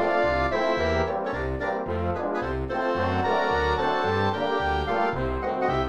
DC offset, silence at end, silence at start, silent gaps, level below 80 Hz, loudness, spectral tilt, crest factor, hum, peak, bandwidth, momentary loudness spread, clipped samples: 0.6%; 0 s; 0 s; none; -38 dBFS; -25 LUFS; -6.5 dB/octave; 14 dB; none; -12 dBFS; 11 kHz; 5 LU; under 0.1%